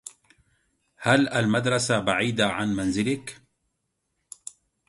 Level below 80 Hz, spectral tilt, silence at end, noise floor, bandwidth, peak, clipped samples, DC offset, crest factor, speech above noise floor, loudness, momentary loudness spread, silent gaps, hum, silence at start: -56 dBFS; -4.5 dB/octave; 1.55 s; -77 dBFS; 11.5 kHz; -4 dBFS; under 0.1%; under 0.1%; 22 dB; 54 dB; -24 LUFS; 20 LU; none; none; 0.05 s